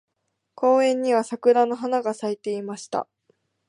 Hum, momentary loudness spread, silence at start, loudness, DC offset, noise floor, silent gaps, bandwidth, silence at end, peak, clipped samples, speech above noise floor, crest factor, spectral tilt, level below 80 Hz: none; 11 LU; 0.6 s; -23 LUFS; under 0.1%; -77 dBFS; none; 11 kHz; 0.65 s; -6 dBFS; under 0.1%; 55 dB; 18 dB; -4.5 dB/octave; -78 dBFS